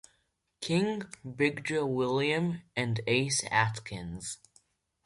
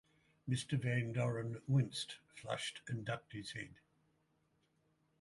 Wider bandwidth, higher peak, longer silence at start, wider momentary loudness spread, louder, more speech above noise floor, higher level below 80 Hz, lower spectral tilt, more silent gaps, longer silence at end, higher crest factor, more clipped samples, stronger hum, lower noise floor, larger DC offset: about the same, 11.5 kHz vs 11.5 kHz; first, -10 dBFS vs -24 dBFS; first, 0.6 s vs 0.45 s; about the same, 13 LU vs 12 LU; first, -30 LUFS vs -40 LUFS; first, 45 dB vs 39 dB; first, -62 dBFS vs -72 dBFS; about the same, -4.5 dB/octave vs -5.5 dB/octave; neither; second, 0.7 s vs 1.45 s; about the same, 20 dB vs 18 dB; neither; neither; about the same, -76 dBFS vs -78 dBFS; neither